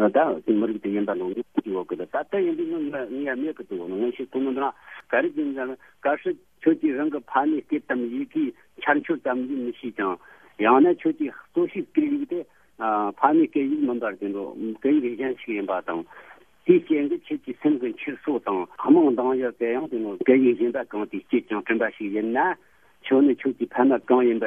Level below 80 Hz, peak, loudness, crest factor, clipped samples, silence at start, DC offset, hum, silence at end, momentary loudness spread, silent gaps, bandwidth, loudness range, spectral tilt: -70 dBFS; -2 dBFS; -24 LUFS; 22 dB; under 0.1%; 0 s; under 0.1%; none; 0 s; 11 LU; none; 3.6 kHz; 5 LU; -8.5 dB/octave